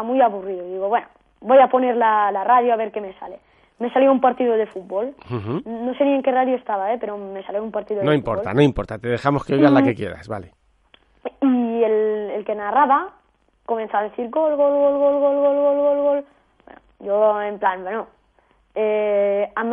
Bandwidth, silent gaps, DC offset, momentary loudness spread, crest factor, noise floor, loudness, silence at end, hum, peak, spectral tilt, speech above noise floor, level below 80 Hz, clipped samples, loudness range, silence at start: 6.4 kHz; none; under 0.1%; 13 LU; 18 dB; -60 dBFS; -19 LUFS; 0 s; none; -2 dBFS; -8.5 dB/octave; 41 dB; -50 dBFS; under 0.1%; 4 LU; 0 s